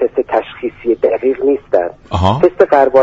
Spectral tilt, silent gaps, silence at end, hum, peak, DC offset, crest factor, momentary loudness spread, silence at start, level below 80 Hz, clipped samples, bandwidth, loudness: -8 dB/octave; none; 0 s; none; 0 dBFS; under 0.1%; 12 dB; 8 LU; 0 s; -38 dBFS; under 0.1%; 7.8 kHz; -14 LUFS